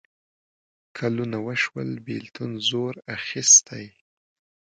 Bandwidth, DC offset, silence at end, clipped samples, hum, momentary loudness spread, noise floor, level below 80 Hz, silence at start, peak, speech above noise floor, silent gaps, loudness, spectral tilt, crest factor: 10.5 kHz; under 0.1%; 0.8 s; under 0.1%; none; 19 LU; under -90 dBFS; -68 dBFS; 0.95 s; -2 dBFS; over 66 dB; none; -21 LUFS; -2 dB/octave; 24 dB